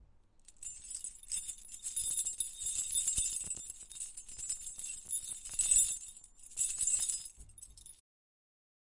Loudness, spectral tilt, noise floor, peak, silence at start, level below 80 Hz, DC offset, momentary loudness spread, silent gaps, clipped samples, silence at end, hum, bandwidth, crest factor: -34 LUFS; 1.5 dB/octave; -62 dBFS; -14 dBFS; 0 s; -60 dBFS; under 0.1%; 19 LU; none; under 0.1%; 1.05 s; none; 11.5 kHz; 24 dB